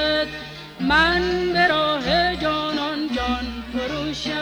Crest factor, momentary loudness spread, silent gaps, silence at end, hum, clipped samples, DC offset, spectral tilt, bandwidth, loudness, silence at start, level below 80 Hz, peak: 16 dB; 10 LU; none; 0 s; none; under 0.1%; under 0.1%; -4.5 dB/octave; over 20 kHz; -21 LUFS; 0 s; -38 dBFS; -6 dBFS